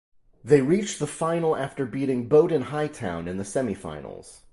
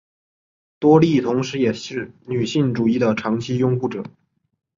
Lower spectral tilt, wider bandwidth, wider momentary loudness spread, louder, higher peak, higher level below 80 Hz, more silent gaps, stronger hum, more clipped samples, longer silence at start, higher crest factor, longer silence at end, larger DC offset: about the same, -6 dB/octave vs -7 dB/octave; first, 11.5 kHz vs 7.6 kHz; about the same, 15 LU vs 14 LU; second, -25 LUFS vs -19 LUFS; second, -6 dBFS vs -2 dBFS; about the same, -54 dBFS vs -58 dBFS; neither; neither; neither; second, 0.45 s vs 0.8 s; about the same, 20 dB vs 18 dB; second, 0.15 s vs 0.7 s; neither